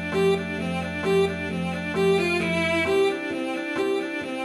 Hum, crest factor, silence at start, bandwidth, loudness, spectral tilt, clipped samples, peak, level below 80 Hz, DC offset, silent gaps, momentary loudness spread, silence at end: none; 12 dB; 0 s; 13.5 kHz; -24 LUFS; -5.5 dB/octave; under 0.1%; -12 dBFS; -52 dBFS; under 0.1%; none; 6 LU; 0 s